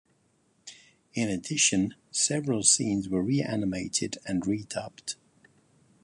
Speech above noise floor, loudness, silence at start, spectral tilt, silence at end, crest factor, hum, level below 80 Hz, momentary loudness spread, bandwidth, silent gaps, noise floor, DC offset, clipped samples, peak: 40 dB; -27 LUFS; 0.65 s; -3 dB/octave; 0.9 s; 24 dB; none; -60 dBFS; 16 LU; 11.5 kHz; none; -68 dBFS; under 0.1%; under 0.1%; -6 dBFS